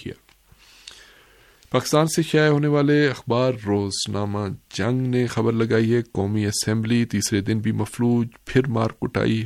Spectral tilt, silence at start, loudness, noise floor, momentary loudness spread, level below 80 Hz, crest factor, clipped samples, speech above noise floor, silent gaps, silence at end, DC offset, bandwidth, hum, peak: -5.5 dB/octave; 0 s; -22 LUFS; -54 dBFS; 7 LU; -52 dBFS; 18 dB; under 0.1%; 33 dB; none; 0 s; under 0.1%; 15 kHz; none; -4 dBFS